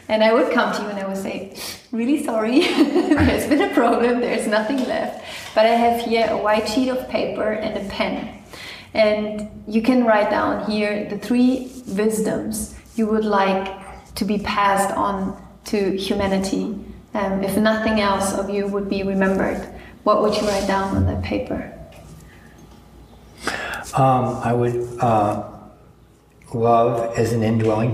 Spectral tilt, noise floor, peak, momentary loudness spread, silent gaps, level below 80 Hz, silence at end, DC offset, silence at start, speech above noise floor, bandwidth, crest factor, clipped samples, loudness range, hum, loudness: -5.5 dB/octave; -51 dBFS; -4 dBFS; 12 LU; none; -44 dBFS; 0 s; under 0.1%; 0.1 s; 31 dB; 15.5 kHz; 16 dB; under 0.1%; 4 LU; none; -20 LUFS